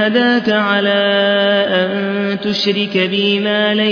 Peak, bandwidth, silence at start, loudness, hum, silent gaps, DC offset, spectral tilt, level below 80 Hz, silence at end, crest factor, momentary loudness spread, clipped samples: -2 dBFS; 5.4 kHz; 0 s; -14 LUFS; none; none; under 0.1%; -6 dB/octave; -62 dBFS; 0 s; 14 dB; 5 LU; under 0.1%